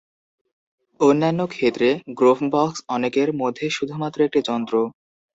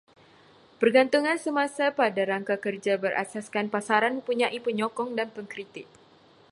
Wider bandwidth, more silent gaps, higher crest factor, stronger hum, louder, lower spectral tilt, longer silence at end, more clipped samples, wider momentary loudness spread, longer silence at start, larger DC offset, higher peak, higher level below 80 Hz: second, 8 kHz vs 11.5 kHz; neither; about the same, 18 dB vs 20 dB; neither; first, -21 LUFS vs -26 LUFS; first, -6 dB/octave vs -4.5 dB/octave; second, 0.5 s vs 0.65 s; neither; second, 7 LU vs 12 LU; first, 1 s vs 0.8 s; neither; first, -4 dBFS vs -8 dBFS; first, -64 dBFS vs -78 dBFS